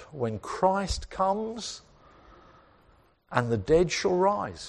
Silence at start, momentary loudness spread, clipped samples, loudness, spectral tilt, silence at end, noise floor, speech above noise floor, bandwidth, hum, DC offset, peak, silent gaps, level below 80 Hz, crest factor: 0 s; 11 LU; under 0.1%; -27 LUFS; -5 dB/octave; 0 s; -61 dBFS; 34 dB; 11.5 kHz; none; under 0.1%; -6 dBFS; none; -46 dBFS; 22 dB